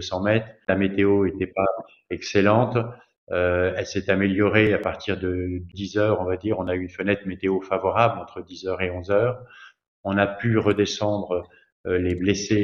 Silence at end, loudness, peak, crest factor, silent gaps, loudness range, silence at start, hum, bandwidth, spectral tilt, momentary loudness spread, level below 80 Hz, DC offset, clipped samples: 0 s; -23 LUFS; -2 dBFS; 20 dB; 3.18-3.27 s, 9.88-10.04 s, 11.72-11.84 s; 3 LU; 0 s; none; 7.4 kHz; -6 dB/octave; 11 LU; -52 dBFS; under 0.1%; under 0.1%